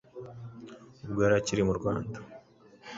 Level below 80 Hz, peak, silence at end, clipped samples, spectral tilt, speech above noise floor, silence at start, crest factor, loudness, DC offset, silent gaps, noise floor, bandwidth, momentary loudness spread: -54 dBFS; -12 dBFS; 0 s; under 0.1%; -6 dB/octave; 27 dB; 0.15 s; 20 dB; -29 LUFS; under 0.1%; none; -55 dBFS; 8 kHz; 23 LU